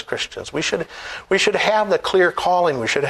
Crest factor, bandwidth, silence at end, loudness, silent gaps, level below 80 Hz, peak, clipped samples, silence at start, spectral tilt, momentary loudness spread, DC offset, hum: 18 dB; 13 kHz; 0 s; -19 LUFS; none; -52 dBFS; -2 dBFS; under 0.1%; 0 s; -3.5 dB/octave; 9 LU; under 0.1%; none